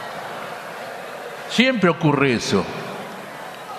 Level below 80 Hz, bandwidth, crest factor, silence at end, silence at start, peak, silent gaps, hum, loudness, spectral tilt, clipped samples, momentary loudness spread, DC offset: -58 dBFS; 13.5 kHz; 22 dB; 0 s; 0 s; 0 dBFS; none; none; -21 LUFS; -5 dB/octave; under 0.1%; 16 LU; under 0.1%